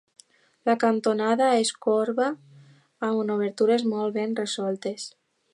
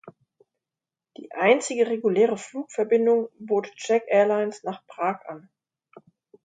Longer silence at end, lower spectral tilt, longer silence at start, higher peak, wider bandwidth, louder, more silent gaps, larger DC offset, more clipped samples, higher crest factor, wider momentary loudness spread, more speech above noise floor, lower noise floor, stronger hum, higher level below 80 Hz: second, 0.45 s vs 1.05 s; about the same, -4.5 dB/octave vs -4.5 dB/octave; first, 0.65 s vs 0.05 s; second, -8 dBFS vs -4 dBFS; first, 11.5 kHz vs 9.4 kHz; about the same, -25 LUFS vs -24 LUFS; neither; neither; neither; about the same, 18 dB vs 20 dB; second, 10 LU vs 15 LU; second, 30 dB vs 67 dB; second, -54 dBFS vs -90 dBFS; neither; about the same, -82 dBFS vs -78 dBFS